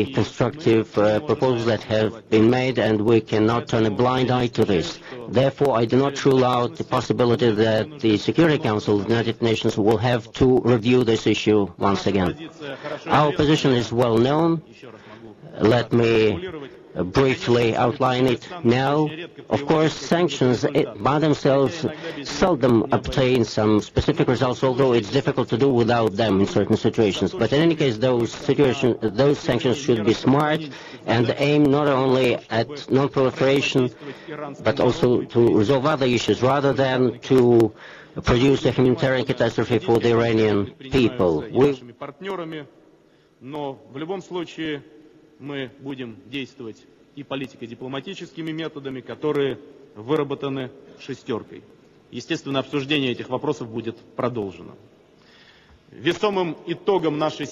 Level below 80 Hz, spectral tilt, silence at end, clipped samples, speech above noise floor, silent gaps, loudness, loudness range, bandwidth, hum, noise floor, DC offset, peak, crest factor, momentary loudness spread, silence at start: -48 dBFS; -6.5 dB/octave; 0 s; under 0.1%; 35 dB; none; -21 LUFS; 10 LU; 13 kHz; none; -56 dBFS; under 0.1%; -6 dBFS; 16 dB; 14 LU; 0 s